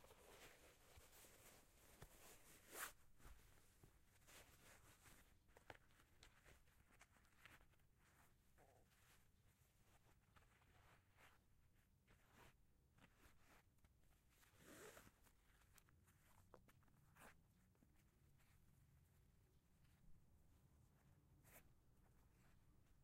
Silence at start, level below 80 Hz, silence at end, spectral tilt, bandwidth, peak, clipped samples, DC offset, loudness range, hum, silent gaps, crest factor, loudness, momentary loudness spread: 0 s; -78 dBFS; 0 s; -3 dB/octave; 16 kHz; -40 dBFS; under 0.1%; under 0.1%; 1 LU; none; none; 30 dB; -64 LUFS; 13 LU